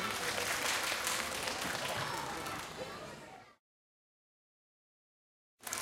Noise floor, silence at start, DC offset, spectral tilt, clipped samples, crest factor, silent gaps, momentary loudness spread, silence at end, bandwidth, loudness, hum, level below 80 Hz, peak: under -90 dBFS; 0 s; under 0.1%; -1.5 dB/octave; under 0.1%; 24 dB; 3.59-5.58 s; 16 LU; 0 s; 17 kHz; -36 LUFS; none; -66 dBFS; -16 dBFS